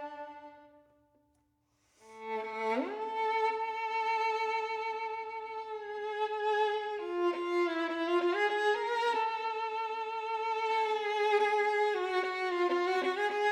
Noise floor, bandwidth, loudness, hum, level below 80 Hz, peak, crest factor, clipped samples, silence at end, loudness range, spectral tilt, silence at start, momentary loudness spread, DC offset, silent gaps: -75 dBFS; 10.5 kHz; -32 LUFS; none; -80 dBFS; -18 dBFS; 16 dB; under 0.1%; 0 s; 5 LU; -2.5 dB/octave; 0 s; 10 LU; under 0.1%; none